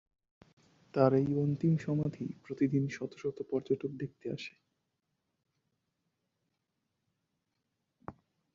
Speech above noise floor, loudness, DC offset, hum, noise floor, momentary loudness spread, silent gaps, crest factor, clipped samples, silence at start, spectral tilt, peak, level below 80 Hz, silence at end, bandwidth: 52 dB; -33 LUFS; under 0.1%; none; -84 dBFS; 18 LU; none; 24 dB; under 0.1%; 0.95 s; -8.5 dB/octave; -12 dBFS; -70 dBFS; 0.45 s; 7.4 kHz